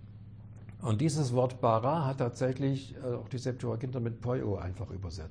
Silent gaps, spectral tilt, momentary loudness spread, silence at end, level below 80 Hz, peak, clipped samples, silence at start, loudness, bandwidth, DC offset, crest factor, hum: none; -7 dB/octave; 13 LU; 0 s; -56 dBFS; -14 dBFS; under 0.1%; 0 s; -32 LUFS; 10.5 kHz; under 0.1%; 18 dB; none